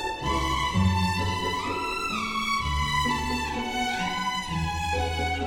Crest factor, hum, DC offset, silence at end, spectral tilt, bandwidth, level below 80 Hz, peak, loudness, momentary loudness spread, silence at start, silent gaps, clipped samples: 16 dB; none; under 0.1%; 0 s; -4.5 dB/octave; 18 kHz; -38 dBFS; -12 dBFS; -27 LUFS; 4 LU; 0 s; none; under 0.1%